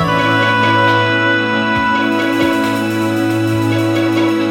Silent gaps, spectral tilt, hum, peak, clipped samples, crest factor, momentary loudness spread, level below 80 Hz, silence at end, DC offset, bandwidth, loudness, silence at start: none; -5.5 dB/octave; none; -2 dBFS; under 0.1%; 12 dB; 4 LU; -46 dBFS; 0 s; under 0.1%; 16.5 kHz; -14 LUFS; 0 s